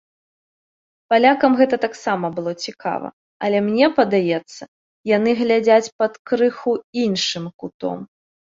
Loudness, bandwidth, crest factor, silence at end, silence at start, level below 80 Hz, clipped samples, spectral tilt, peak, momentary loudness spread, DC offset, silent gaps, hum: -19 LUFS; 7.8 kHz; 18 dB; 0.5 s; 1.1 s; -66 dBFS; under 0.1%; -5 dB/octave; -2 dBFS; 13 LU; under 0.1%; 3.13-3.40 s, 4.68-5.04 s, 5.92-5.99 s, 6.19-6.25 s, 6.84-6.93 s, 7.54-7.59 s, 7.74-7.80 s; none